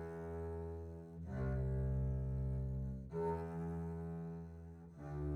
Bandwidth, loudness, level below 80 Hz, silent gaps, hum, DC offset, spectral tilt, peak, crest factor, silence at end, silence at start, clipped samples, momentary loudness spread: 4.3 kHz; -43 LUFS; -48 dBFS; none; none; under 0.1%; -10.5 dB/octave; -30 dBFS; 12 dB; 0 s; 0 s; under 0.1%; 11 LU